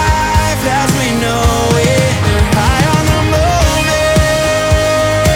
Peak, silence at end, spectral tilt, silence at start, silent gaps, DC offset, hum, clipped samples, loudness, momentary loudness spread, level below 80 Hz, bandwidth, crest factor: 0 dBFS; 0 s; -4.5 dB/octave; 0 s; none; under 0.1%; none; under 0.1%; -12 LUFS; 2 LU; -20 dBFS; 17 kHz; 10 dB